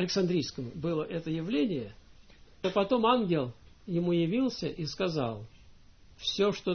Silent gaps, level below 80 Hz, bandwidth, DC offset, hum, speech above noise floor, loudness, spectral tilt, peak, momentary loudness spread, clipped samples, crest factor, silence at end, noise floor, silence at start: none; -58 dBFS; 6.6 kHz; under 0.1%; none; 26 dB; -31 LUFS; -6 dB/octave; -12 dBFS; 10 LU; under 0.1%; 20 dB; 0 s; -56 dBFS; 0 s